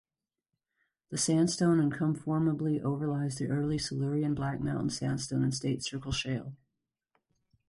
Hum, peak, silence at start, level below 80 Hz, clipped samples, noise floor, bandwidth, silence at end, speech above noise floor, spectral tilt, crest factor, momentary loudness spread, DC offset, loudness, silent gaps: none; -16 dBFS; 1.1 s; -58 dBFS; under 0.1%; -89 dBFS; 11.5 kHz; 1.15 s; 59 dB; -5.5 dB/octave; 14 dB; 7 LU; under 0.1%; -31 LUFS; none